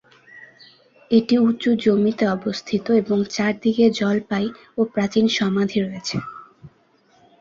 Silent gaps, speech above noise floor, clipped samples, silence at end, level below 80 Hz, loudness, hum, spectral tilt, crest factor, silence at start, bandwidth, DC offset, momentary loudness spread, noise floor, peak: none; 39 dB; under 0.1%; 0.75 s; -60 dBFS; -20 LUFS; none; -6 dB/octave; 18 dB; 0.35 s; 7.6 kHz; under 0.1%; 9 LU; -58 dBFS; -4 dBFS